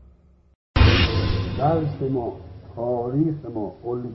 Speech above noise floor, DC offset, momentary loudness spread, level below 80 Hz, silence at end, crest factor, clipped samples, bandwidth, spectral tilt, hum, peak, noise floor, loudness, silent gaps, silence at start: 29 dB; under 0.1%; 14 LU; -30 dBFS; 0 s; 18 dB; under 0.1%; 6 kHz; -8 dB/octave; none; -4 dBFS; -54 dBFS; -23 LUFS; none; 0.75 s